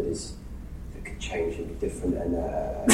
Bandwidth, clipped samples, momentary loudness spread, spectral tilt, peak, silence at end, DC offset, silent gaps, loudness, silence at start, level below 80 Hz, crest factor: 15.5 kHz; under 0.1%; 13 LU; -4.5 dB/octave; -4 dBFS; 0 s; under 0.1%; none; -31 LUFS; 0 s; -38 dBFS; 24 dB